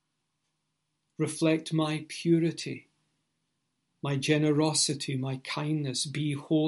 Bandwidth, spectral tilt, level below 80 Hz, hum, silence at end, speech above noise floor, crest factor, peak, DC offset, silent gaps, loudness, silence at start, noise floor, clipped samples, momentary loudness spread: 11.5 kHz; -5 dB/octave; -74 dBFS; none; 0 s; 52 dB; 18 dB; -12 dBFS; under 0.1%; none; -29 LUFS; 1.2 s; -81 dBFS; under 0.1%; 9 LU